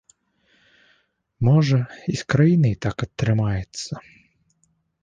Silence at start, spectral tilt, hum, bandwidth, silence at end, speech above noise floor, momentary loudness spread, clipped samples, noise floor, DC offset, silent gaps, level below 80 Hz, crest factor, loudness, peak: 1.4 s; -7 dB/octave; none; 9.4 kHz; 1.05 s; 47 dB; 14 LU; under 0.1%; -67 dBFS; under 0.1%; none; -48 dBFS; 18 dB; -21 LUFS; -4 dBFS